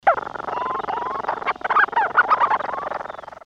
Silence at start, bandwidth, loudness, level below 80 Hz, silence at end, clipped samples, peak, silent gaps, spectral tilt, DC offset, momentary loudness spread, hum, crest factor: 0.05 s; 8.2 kHz; -21 LUFS; -58 dBFS; 0.1 s; under 0.1%; -4 dBFS; none; -4.5 dB/octave; under 0.1%; 11 LU; none; 18 dB